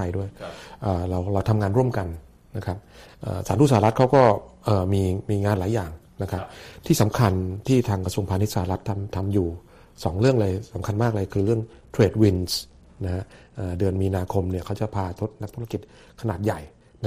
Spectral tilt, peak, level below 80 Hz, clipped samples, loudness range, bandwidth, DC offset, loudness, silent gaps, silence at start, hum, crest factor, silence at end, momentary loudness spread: -7 dB/octave; -4 dBFS; -46 dBFS; under 0.1%; 6 LU; 15.5 kHz; under 0.1%; -24 LUFS; none; 0 s; none; 18 dB; 0 s; 15 LU